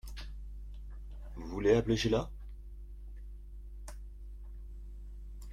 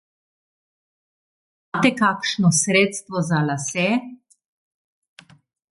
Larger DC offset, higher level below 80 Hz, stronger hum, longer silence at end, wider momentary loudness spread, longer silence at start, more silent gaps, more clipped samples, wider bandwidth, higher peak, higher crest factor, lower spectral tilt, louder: neither; first, -44 dBFS vs -66 dBFS; first, 50 Hz at -45 dBFS vs none; second, 0 s vs 1.6 s; first, 22 LU vs 9 LU; second, 0.05 s vs 1.75 s; neither; neither; first, 14.5 kHz vs 11.5 kHz; second, -14 dBFS vs -4 dBFS; about the same, 24 dB vs 20 dB; first, -6 dB/octave vs -4 dB/octave; second, -32 LUFS vs -20 LUFS